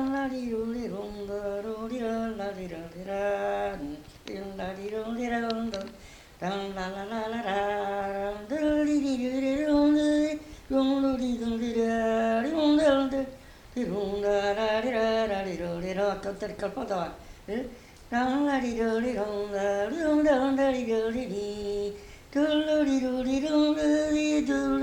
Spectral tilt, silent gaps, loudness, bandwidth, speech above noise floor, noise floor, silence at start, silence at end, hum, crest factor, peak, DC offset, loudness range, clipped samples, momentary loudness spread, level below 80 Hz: -5.5 dB/octave; none; -28 LUFS; 12 kHz; 22 dB; -49 dBFS; 0 s; 0 s; none; 16 dB; -12 dBFS; under 0.1%; 7 LU; under 0.1%; 12 LU; -52 dBFS